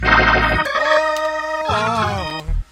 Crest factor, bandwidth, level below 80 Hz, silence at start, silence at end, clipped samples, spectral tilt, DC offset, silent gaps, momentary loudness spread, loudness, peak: 18 dB; 16.5 kHz; -28 dBFS; 0 s; 0.1 s; under 0.1%; -4.5 dB/octave; under 0.1%; none; 11 LU; -17 LUFS; 0 dBFS